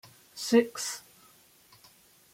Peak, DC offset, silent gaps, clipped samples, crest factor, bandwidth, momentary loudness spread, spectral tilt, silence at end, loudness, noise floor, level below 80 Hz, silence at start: -10 dBFS; under 0.1%; none; under 0.1%; 22 dB; 16.5 kHz; 18 LU; -3 dB/octave; 1.35 s; -28 LUFS; -60 dBFS; -76 dBFS; 0.35 s